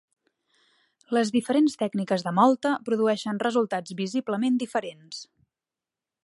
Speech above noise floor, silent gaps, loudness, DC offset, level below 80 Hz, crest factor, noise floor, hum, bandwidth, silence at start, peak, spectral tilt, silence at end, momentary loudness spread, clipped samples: 65 dB; none; -25 LUFS; under 0.1%; -76 dBFS; 20 dB; -90 dBFS; none; 11.5 kHz; 1.1 s; -6 dBFS; -5.5 dB/octave; 1 s; 10 LU; under 0.1%